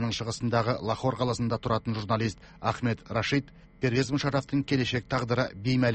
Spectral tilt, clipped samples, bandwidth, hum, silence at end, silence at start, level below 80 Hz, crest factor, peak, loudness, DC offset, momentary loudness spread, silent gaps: -6 dB/octave; under 0.1%; 8.4 kHz; none; 0 s; 0 s; -52 dBFS; 16 dB; -12 dBFS; -29 LUFS; under 0.1%; 4 LU; none